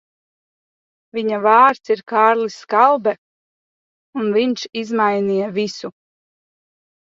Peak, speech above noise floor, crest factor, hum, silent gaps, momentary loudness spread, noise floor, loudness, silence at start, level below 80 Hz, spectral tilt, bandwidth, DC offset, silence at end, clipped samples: 0 dBFS; over 73 dB; 20 dB; none; 3.18-4.13 s; 15 LU; under -90 dBFS; -17 LUFS; 1.15 s; -68 dBFS; -5 dB/octave; 7.6 kHz; under 0.1%; 1.1 s; under 0.1%